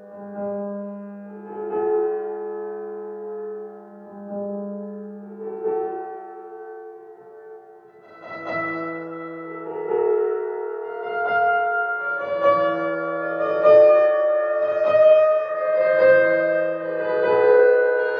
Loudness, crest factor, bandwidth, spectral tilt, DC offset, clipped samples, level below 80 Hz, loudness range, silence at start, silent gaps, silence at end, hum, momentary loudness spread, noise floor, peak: -20 LUFS; 18 dB; 5.2 kHz; -7.5 dB/octave; under 0.1%; under 0.1%; -74 dBFS; 15 LU; 0 s; none; 0 s; none; 21 LU; -47 dBFS; -4 dBFS